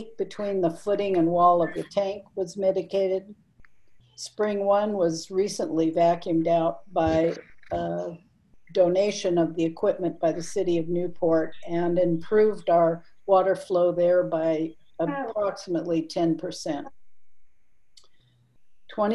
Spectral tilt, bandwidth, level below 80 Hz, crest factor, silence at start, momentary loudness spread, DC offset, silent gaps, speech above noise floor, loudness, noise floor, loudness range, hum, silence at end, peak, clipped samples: -6 dB/octave; 12 kHz; -56 dBFS; 18 dB; 0 s; 10 LU; 0.4%; none; 42 dB; -25 LUFS; -66 dBFS; 6 LU; none; 0 s; -8 dBFS; under 0.1%